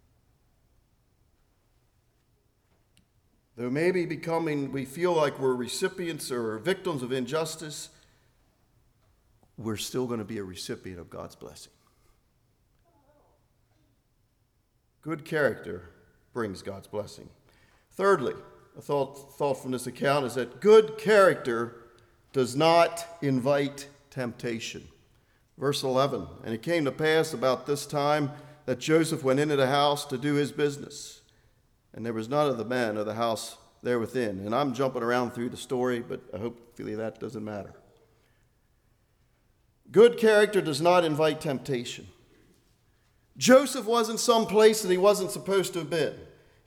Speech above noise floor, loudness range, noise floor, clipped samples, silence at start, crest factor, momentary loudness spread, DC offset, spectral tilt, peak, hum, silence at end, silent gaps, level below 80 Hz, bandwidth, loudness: 44 dB; 13 LU; -70 dBFS; under 0.1%; 3.55 s; 22 dB; 18 LU; under 0.1%; -4.5 dB/octave; -6 dBFS; none; 0.4 s; none; -66 dBFS; 18 kHz; -27 LUFS